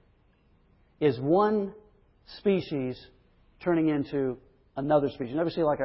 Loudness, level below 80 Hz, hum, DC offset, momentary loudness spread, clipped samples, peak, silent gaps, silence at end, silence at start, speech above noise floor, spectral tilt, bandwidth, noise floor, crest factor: -28 LUFS; -60 dBFS; none; under 0.1%; 14 LU; under 0.1%; -12 dBFS; none; 0 s; 1 s; 37 dB; -11 dB/octave; 5.8 kHz; -64 dBFS; 18 dB